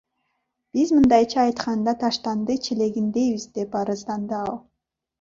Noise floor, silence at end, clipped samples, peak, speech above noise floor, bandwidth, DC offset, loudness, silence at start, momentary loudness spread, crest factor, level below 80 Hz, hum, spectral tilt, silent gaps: -75 dBFS; 0.65 s; under 0.1%; -4 dBFS; 54 dB; 7.6 kHz; under 0.1%; -22 LUFS; 0.75 s; 11 LU; 18 dB; -56 dBFS; none; -5.5 dB/octave; none